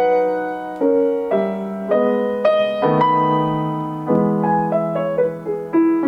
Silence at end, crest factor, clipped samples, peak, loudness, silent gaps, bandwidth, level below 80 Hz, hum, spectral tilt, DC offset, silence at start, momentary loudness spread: 0 s; 14 dB; under 0.1%; -4 dBFS; -18 LUFS; none; 6.2 kHz; -56 dBFS; none; -9 dB/octave; under 0.1%; 0 s; 7 LU